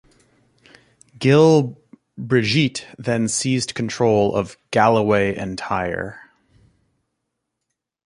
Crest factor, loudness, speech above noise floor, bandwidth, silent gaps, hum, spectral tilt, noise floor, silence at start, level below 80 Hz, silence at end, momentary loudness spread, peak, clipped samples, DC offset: 20 dB; -19 LUFS; 61 dB; 11.5 kHz; none; none; -5 dB/octave; -79 dBFS; 1.2 s; -52 dBFS; 1.85 s; 13 LU; -2 dBFS; under 0.1%; under 0.1%